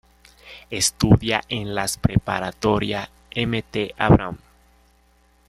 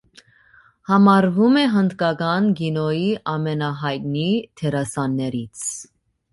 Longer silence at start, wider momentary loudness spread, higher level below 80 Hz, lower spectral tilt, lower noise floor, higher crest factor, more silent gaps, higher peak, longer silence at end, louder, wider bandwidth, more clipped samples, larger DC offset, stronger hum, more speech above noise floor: second, 0.45 s vs 0.9 s; first, 15 LU vs 12 LU; first, -38 dBFS vs -58 dBFS; about the same, -5 dB/octave vs -6 dB/octave; first, -58 dBFS vs -54 dBFS; about the same, 20 dB vs 16 dB; neither; about the same, -2 dBFS vs -4 dBFS; first, 1.1 s vs 0.5 s; about the same, -21 LUFS vs -20 LUFS; first, 15 kHz vs 11.5 kHz; neither; neither; neither; first, 38 dB vs 34 dB